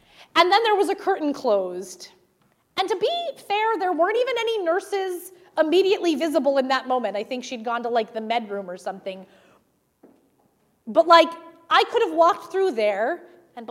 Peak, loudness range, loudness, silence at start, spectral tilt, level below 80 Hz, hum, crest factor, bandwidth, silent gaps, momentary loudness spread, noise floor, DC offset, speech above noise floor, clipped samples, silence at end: -2 dBFS; 8 LU; -22 LUFS; 0.2 s; -3 dB/octave; -76 dBFS; none; 22 dB; 15.5 kHz; none; 15 LU; -65 dBFS; under 0.1%; 43 dB; under 0.1%; 0.05 s